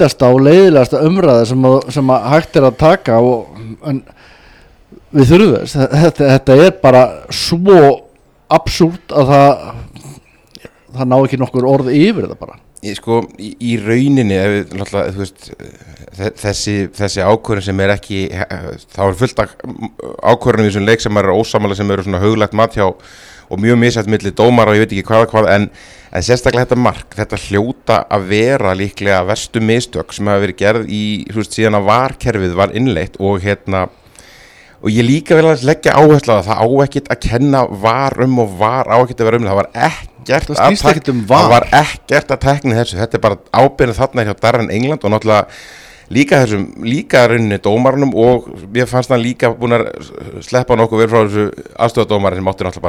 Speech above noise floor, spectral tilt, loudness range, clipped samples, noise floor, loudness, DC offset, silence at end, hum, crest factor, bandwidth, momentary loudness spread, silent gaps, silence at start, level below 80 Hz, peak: 31 dB; -6 dB/octave; 6 LU; 0.3%; -43 dBFS; -12 LUFS; under 0.1%; 0 s; none; 12 dB; 16 kHz; 12 LU; none; 0 s; -36 dBFS; 0 dBFS